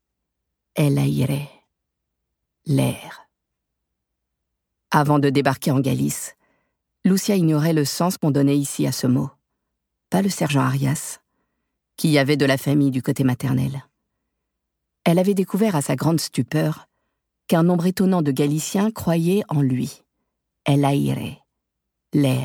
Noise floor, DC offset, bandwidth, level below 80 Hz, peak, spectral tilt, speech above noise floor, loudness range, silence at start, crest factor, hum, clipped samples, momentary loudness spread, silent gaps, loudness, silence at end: -80 dBFS; under 0.1%; 18.5 kHz; -58 dBFS; -2 dBFS; -6 dB/octave; 60 dB; 4 LU; 0.75 s; 18 dB; none; under 0.1%; 10 LU; none; -21 LUFS; 0 s